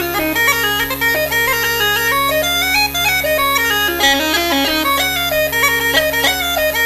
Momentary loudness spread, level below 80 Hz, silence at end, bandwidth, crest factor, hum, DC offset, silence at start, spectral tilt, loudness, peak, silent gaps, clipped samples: 2 LU; -36 dBFS; 0 s; 15.5 kHz; 16 dB; none; under 0.1%; 0 s; -1.5 dB/octave; -13 LUFS; 0 dBFS; none; under 0.1%